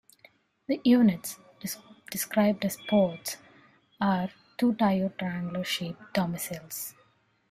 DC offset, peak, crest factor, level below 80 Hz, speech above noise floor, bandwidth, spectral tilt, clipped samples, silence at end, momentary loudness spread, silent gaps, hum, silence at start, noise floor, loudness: under 0.1%; -10 dBFS; 18 dB; -66 dBFS; 39 dB; 16 kHz; -5 dB/octave; under 0.1%; 0.6 s; 14 LU; none; none; 0.7 s; -66 dBFS; -28 LUFS